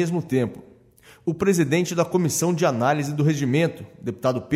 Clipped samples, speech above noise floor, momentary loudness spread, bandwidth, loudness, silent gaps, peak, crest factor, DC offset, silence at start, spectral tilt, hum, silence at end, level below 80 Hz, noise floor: under 0.1%; 30 dB; 9 LU; 16 kHz; -22 LUFS; none; -6 dBFS; 16 dB; under 0.1%; 0 s; -5.5 dB/octave; none; 0 s; -60 dBFS; -52 dBFS